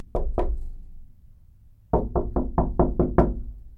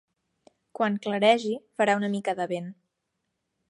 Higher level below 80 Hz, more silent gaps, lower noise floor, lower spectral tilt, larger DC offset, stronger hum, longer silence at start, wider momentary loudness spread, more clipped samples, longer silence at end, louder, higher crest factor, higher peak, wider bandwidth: first, -28 dBFS vs -78 dBFS; neither; second, -52 dBFS vs -80 dBFS; first, -11.5 dB/octave vs -5 dB/octave; neither; neither; second, 0 s vs 0.8 s; about the same, 13 LU vs 11 LU; neither; second, 0 s vs 0.95 s; about the same, -26 LUFS vs -26 LUFS; about the same, 22 dB vs 22 dB; about the same, -4 dBFS vs -6 dBFS; second, 3.3 kHz vs 11.5 kHz